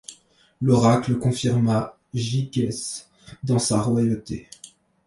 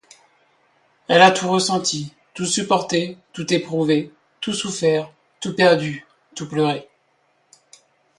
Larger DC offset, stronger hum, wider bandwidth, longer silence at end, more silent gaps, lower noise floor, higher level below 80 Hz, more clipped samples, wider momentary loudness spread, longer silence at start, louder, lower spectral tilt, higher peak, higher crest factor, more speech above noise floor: neither; neither; about the same, 11.5 kHz vs 11.5 kHz; second, 0.4 s vs 1.35 s; neither; second, -53 dBFS vs -64 dBFS; first, -52 dBFS vs -64 dBFS; neither; second, 16 LU vs 20 LU; second, 0.1 s vs 1.1 s; about the same, -22 LUFS vs -20 LUFS; first, -6 dB/octave vs -4 dB/octave; second, -6 dBFS vs 0 dBFS; about the same, 18 dB vs 22 dB; second, 32 dB vs 45 dB